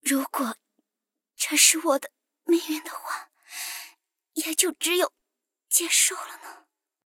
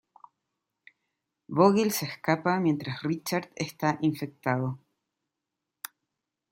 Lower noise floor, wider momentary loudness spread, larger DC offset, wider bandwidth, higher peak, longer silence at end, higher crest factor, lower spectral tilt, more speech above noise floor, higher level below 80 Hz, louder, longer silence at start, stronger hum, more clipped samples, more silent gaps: about the same, -87 dBFS vs -86 dBFS; about the same, 21 LU vs 21 LU; neither; about the same, 17 kHz vs 16.5 kHz; about the same, -4 dBFS vs -6 dBFS; second, 0.55 s vs 1.75 s; about the same, 24 dB vs 24 dB; second, 1 dB/octave vs -5.5 dB/octave; first, 63 dB vs 59 dB; second, under -90 dBFS vs -72 dBFS; first, -23 LUFS vs -28 LUFS; second, 0.05 s vs 1.5 s; neither; neither; neither